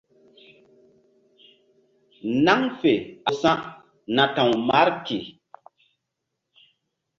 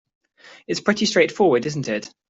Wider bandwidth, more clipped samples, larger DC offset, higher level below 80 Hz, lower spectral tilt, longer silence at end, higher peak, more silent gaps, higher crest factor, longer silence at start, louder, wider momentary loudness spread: about the same, 7.6 kHz vs 8.2 kHz; neither; neither; about the same, -64 dBFS vs -64 dBFS; about the same, -5.5 dB/octave vs -4.5 dB/octave; first, 1.9 s vs 0.2 s; about the same, -2 dBFS vs -4 dBFS; neither; about the same, 22 dB vs 18 dB; first, 2.25 s vs 0.45 s; about the same, -22 LUFS vs -20 LUFS; first, 14 LU vs 10 LU